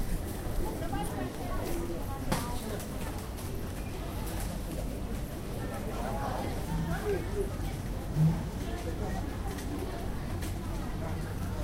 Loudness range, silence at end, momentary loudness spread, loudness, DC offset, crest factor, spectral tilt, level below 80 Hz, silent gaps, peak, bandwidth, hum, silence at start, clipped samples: 4 LU; 0 s; 5 LU; -36 LUFS; under 0.1%; 20 dB; -6 dB/octave; -38 dBFS; none; -14 dBFS; 16 kHz; none; 0 s; under 0.1%